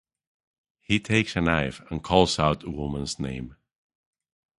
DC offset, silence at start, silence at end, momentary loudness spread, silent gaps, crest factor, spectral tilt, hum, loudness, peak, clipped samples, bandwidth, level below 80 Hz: under 0.1%; 0.9 s; 1.05 s; 12 LU; none; 24 dB; -5 dB/octave; none; -25 LUFS; -2 dBFS; under 0.1%; 11.5 kHz; -44 dBFS